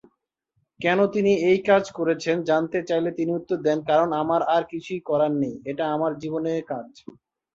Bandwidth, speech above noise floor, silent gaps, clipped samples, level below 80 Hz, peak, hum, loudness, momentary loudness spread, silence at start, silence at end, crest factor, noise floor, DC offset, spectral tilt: 7.8 kHz; 51 dB; none; under 0.1%; -66 dBFS; -6 dBFS; none; -23 LUFS; 8 LU; 0.8 s; 0.65 s; 18 dB; -74 dBFS; under 0.1%; -6.5 dB/octave